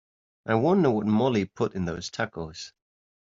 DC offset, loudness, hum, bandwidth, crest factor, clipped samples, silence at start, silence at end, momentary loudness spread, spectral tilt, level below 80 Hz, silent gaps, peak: under 0.1%; -26 LUFS; none; 7.6 kHz; 20 dB; under 0.1%; 0.45 s; 0.7 s; 17 LU; -6 dB/octave; -60 dBFS; none; -8 dBFS